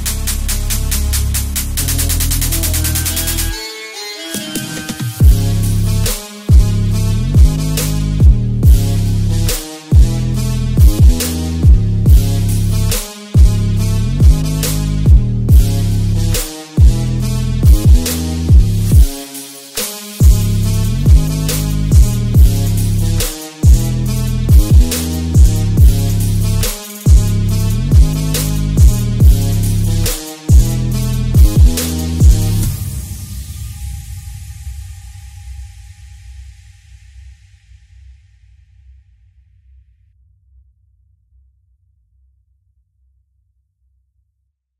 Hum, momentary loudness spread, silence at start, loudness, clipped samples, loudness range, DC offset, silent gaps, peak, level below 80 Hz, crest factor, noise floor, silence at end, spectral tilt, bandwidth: none; 12 LU; 0 s; -14 LUFS; under 0.1%; 4 LU; under 0.1%; none; 0 dBFS; -14 dBFS; 12 dB; -68 dBFS; 7.5 s; -5.5 dB/octave; 16.5 kHz